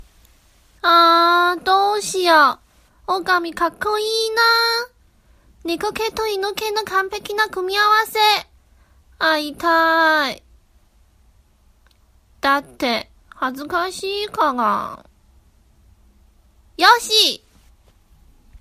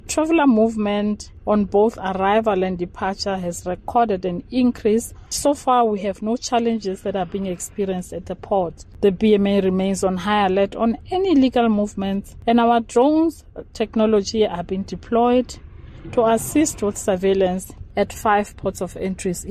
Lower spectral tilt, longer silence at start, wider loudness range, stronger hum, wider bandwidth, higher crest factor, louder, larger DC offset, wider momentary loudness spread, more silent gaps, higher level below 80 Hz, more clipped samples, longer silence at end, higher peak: second, -1.5 dB/octave vs -5.5 dB/octave; first, 0.85 s vs 0.05 s; first, 8 LU vs 3 LU; neither; about the same, 15.5 kHz vs 14.5 kHz; about the same, 20 dB vs 16 dB; first, -17 LUFS vs -20 LUFS; neither; about the same, 11 LU vs 10 LU; neither; second, -54 dBFS vs -44 dBFS; neither; about the same, 0.05 s vs 0 s; first, 0 dBFS vs -4 dBFS